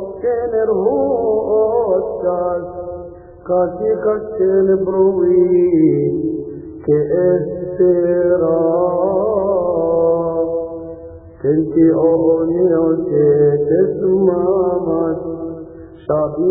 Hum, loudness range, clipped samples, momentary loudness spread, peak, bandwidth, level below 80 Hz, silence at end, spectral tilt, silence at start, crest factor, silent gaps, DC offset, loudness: none; 3 LU; under 0.1%; 13 LU; -2 dBFS; 2.4 kHz; -46 dBFS; 0 s; -14.5 dB/octave; 0 s; 14 dB; none; under 0.1%; -16 LUFS